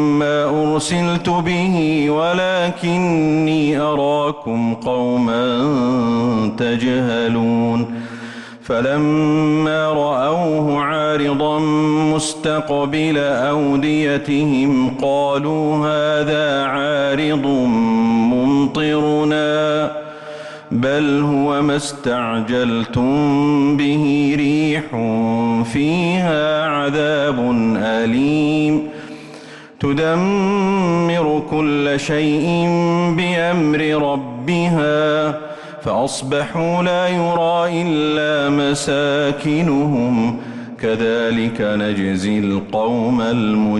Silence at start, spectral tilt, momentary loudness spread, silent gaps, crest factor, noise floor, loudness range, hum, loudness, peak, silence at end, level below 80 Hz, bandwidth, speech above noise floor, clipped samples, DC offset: 0 s; -6 dB/octave; 5 LU; none; 8 dB; -37 dBFS; 2 LU; none; -17 LUFS; -8 dBFS; 0 s; -50 dBFS; 11.5 kHz; 21 dB; under 0.1%; under 0.1%